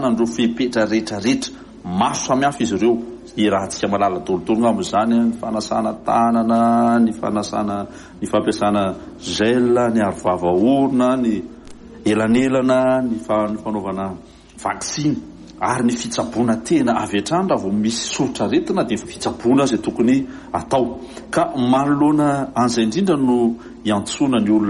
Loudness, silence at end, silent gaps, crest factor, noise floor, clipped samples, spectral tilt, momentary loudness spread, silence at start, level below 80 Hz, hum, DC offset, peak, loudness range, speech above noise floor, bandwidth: -19 LUFS; 0 s; none; 14 dB; -38 dBFS; under 0.1%; -5.5 dB/octave; 9 LU; 0 s; -48 dBFS; none; under 0.1%; -4 dBFS; 2 LU; 20 dB; 11.5 kHz